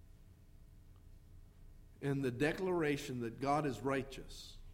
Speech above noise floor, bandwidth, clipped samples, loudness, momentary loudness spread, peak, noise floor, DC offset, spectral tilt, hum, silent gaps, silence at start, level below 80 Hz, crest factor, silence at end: 22 dB; 16 kHz; under 0.1%; -38 LUFS; 14 LU; -22 dBFS; -60 dBFS; under 0.1%; -6 dB/octave; none; none; 0 s; -58 dBFS; 18 dB; 0 s